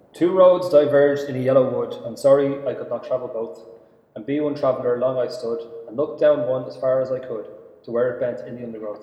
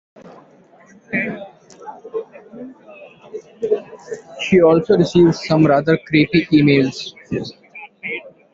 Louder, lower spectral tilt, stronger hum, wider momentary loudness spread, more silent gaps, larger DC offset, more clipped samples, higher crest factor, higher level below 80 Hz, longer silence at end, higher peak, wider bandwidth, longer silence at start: second, -21 LUFS vs -16 LUFS; about the same, -7 dB/octave vs -7 dB/octave; neither; second, 17 LU vs 24 LU; neither; neither; neither; about the same, 18 dB vs 16 dB; second, -66 dBFS vs -52 dBFS; second, 0 s vs 0.25 s; about the same, -4 dBFS vs -2 dBFS; first, 12 kHz vs 7.6 kHz; about the same, 0.15 s vs 0.25 s